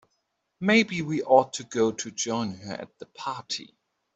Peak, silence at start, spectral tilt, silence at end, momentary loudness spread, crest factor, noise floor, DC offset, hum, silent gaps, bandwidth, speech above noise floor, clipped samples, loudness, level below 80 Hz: -4 dBFS; 0.6 s; -4 dB/octave; 0.5 s; 16 LU; 22 dB; -77 dBFS; under 0.1%; none; none; 8.2 kHz; 51 dB; under 0.1%; -26 LUFS; -68 dBFS